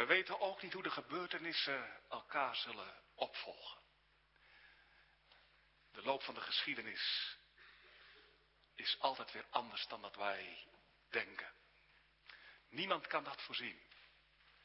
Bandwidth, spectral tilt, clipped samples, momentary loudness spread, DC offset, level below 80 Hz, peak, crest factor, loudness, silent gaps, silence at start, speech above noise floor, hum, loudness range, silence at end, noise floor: 5.6 kHz; 0.5 dB/octave; under 0.1%; 22 LU; under 0.1%; -80 dBFS; -18 dBFS; 28 dB; -42 LUFS; none; 0 s; 30 dB; none; 5 LU; 0.55 s; -74 dBFS